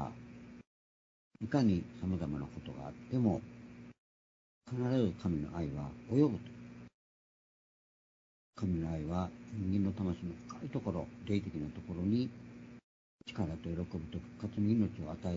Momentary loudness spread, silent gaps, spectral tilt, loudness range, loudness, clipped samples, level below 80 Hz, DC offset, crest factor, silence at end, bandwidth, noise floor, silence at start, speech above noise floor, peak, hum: 20 LU; 0.67-1.31 s, 3.98-4.61 s, 6.94-8.53 s, 12.84-13.19 s; -8.5 dB/octave; 3 LU; -37 LUFS; under 0.1%; -58 dBFS; under 0.1%; 20 dB; 0 s; 7.4 kHz; under -90 dBFS; 0 s; over 54 dB; -16 dBFS; 60 Hz at -55 dBFS